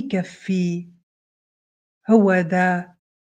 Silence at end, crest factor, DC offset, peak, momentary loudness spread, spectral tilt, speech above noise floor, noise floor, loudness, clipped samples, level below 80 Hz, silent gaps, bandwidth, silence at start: 0.45 s; 20 dB; under 0.1%; -2 dBFS; 12 LU; -7.5 dB/octave; over 71 dB; under -90 dBFS; -20 LUFS; under 0.1%; -70 dBFS; 1.03-2.01 s; 9.2 kHz; 0 s